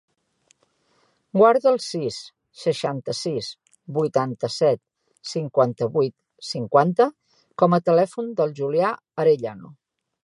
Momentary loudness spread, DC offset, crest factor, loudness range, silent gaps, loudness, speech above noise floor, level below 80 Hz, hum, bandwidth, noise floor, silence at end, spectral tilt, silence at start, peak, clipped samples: 15 LU; under 0.1%; 20 dB; 4 LU; none; -22 LUFS; 45 dB; -70 dBFS; none; 11.5 kHz; -66 dBFS; 0.55 s; -6 dB/octave; 1.35 s; -2 dBFS; under 0.1%